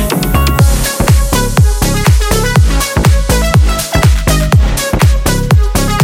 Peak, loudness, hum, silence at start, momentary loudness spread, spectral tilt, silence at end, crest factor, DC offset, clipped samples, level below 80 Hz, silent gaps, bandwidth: 0 dBFS; -11 LUFS; none; 0 s; 2 LU; -5 dB/octave; 0 s; 8 dB; under 0.1%; under 0.1%; -12 dBFS; none; 17 kHz